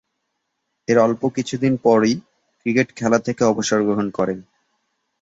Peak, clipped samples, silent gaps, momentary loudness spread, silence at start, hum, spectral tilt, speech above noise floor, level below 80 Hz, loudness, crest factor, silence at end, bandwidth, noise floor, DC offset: -2 dBFS; under 0.1%; none; 9 LU; 0.9 s; none; -5.5 dB/octave; 57 dB; -58 dBFS; -19 LUFS; 18 dB; 0.8 s; 8 kHz; -75 dBFS; under 0.1%